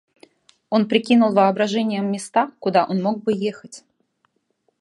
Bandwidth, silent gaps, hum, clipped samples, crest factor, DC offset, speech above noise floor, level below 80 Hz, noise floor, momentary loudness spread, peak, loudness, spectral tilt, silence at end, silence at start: 11.5 kHz; none; none; under 0.1%; 18 dB; under 0.1%; 50 dB; -72 dBFS; -69 dBFS; 8 LU; -2 dBFS; -20 LUFS; -6 dB/octave; 1 s; 0.7 s